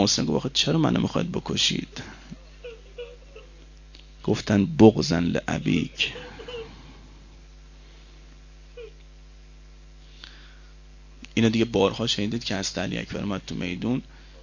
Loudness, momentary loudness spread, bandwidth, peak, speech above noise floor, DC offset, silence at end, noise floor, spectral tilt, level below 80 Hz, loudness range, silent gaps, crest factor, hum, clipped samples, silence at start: -24 LUFS; 22 LU; 7.4 kHz; -2 dBFS; 23 dB; under 0.1%; 0 s; -47 dBFS; -5 dB/octave; -46 dBFS; 9 LU; none; 26 dB; none; under 0.1%; 0 s